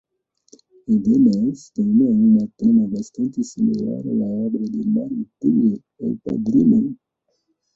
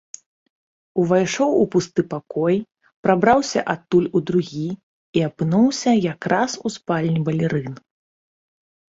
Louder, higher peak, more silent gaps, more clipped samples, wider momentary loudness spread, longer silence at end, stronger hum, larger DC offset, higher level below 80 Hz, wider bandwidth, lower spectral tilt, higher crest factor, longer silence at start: about the same, -19 LUFS vs -20 LUFS; about the same, -4 dBFS vs -2 dBFS; second, none vs 2.96-3.03 s, 4.83-5.13 s; neither; about the same, 11 LU vs 10 LU; second, 0.8 s vs 1.15 s; neither; neither; about the same, -58 dBFS vs -58 dBFS; about the same, 7.6 kHz vs 8 kHz; first, -9.5 dB/octave vs -6 dB/octave; second, 14 dB vs 20 dB; about the same, 0.9 s vs 0.95 s